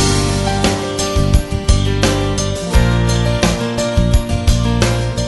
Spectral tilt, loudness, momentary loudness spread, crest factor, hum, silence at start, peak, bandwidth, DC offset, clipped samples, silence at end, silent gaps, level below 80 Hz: -5 dB/octave; -15 LUFS; 3 LU; 14 dB; none; 0 s; 0 dBFS; 12 kHz; under 0.1%; under 0.1%; 0 s; none; -20 dBFS